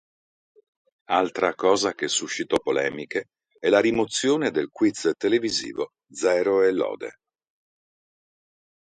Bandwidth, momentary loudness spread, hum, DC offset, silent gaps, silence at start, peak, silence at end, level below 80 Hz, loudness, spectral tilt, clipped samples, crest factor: 11 kHz; 11 LU; none; under 0.1%; none; 1.1 s; -4 dBFS; 1.8 s; -64 dBFS; -24 LUFS; -3 dB/octave; under 0.1%; 20 dB